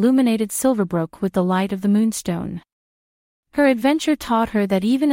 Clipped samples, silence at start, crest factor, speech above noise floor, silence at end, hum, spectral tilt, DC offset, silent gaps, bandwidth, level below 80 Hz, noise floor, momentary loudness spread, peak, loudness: under 0.1%; 0 s; 16 dB; over 71 dB; 0 s; none; -5.5 dB/octave; under 0.1%; 2.72-3.43 s; 16.5 kHz; -52 dBFS; under -90 dBFS; 9 LU; -4 dBFS; -20 LUFS